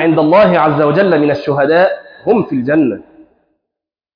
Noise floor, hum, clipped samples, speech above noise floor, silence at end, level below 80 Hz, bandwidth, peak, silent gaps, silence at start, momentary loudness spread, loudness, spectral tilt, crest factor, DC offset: -82 dBFS; none; under 0.1%; 71 dB; 1.15 s; -52 dBFS; 5.2 kHz; 0 dBFS; none; 0 s; 6 LU; -12 LUFS; -9 dB/octave; 12 dB; under 0.1%